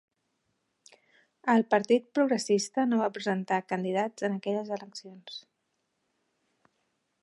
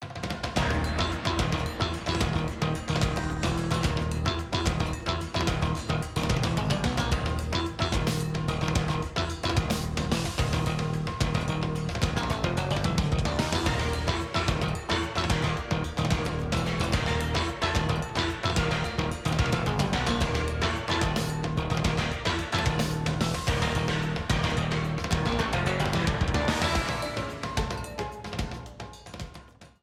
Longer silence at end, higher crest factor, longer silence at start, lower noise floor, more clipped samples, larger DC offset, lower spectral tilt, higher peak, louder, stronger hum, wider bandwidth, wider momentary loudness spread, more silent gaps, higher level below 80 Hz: first, 1.8 s vs 0.15 s; about the same, 20 dB vs 18 dB; first, 1.45 s vs 0 s; first, -79 dBFS vs -49 dBFS; neither; neither; about the same, -5 dB/octave vs -5 dB/octave; about the same, -10 dBFS vs -10 dBFS; about the same, -28 LUFS vs -28 LUFS; neither; second, 11.5 kHz vs 15.5 kHz; first, 18 LU vs 4 LU; neither; second, -84 dBFS vs -36 dBFS